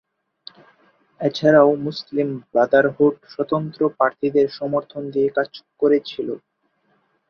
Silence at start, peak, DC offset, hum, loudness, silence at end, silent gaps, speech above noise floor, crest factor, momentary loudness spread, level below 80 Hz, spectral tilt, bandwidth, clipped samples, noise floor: 1.2 s; -2 dBFS; under 0.1%; none; -20 LUFS; 0.95 s; none; 47 dB; 18 dB; 12 LU; -64 dBFS; -7.5 dB/octave; 6.6 kHz; under 0.1%; -66 dBFS